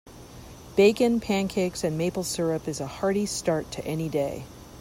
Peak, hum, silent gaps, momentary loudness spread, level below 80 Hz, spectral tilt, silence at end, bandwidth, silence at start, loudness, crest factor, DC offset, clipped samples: -8 dBFS; none; none; 21 LU; -52 dBFS; -5 dB/octave; 0 s; 16 kHz; 0.05 s; -26 LUFS; 18 dB; under 0.1%; under 0.1%